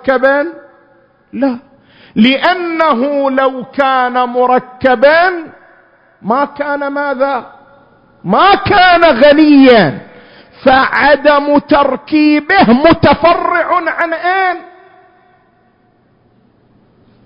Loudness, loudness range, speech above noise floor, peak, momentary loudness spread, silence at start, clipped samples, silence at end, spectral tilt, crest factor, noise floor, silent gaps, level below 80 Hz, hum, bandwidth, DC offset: -10 LUFS; 7 LU; 42 dB; 0 dBFS; 10 LU; 0.05 s; 0.1%; 2.6 s; -7.5 dB/octave; 12 dB; -52 dBFS; none; -42 dBFS; none; 5.4 kHz; under 0.1%